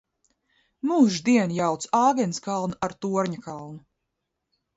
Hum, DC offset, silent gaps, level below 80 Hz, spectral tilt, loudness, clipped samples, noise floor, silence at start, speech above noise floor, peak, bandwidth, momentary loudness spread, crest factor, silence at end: none; under 0.1%; none; -66 dBFS; -5.5 dB/octave; -24 LUFS; under 0.1%; -81 dBFS; 0.85 s; 57 dB; -8 dBFS; 8 kHz; 15 LU; 18 dB; 1 s